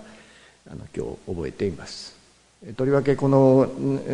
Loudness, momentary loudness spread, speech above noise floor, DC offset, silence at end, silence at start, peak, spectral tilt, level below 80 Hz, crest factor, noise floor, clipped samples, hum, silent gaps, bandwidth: -22 LUFS; 23 LU; 29 dB; under 0.1%; 0 s; 0 s; -6 dBFS; -8 dB/octave; -52 dBFS; 18 dB; -51 dBFS; under 0.1%; none; none; 10.5 kHz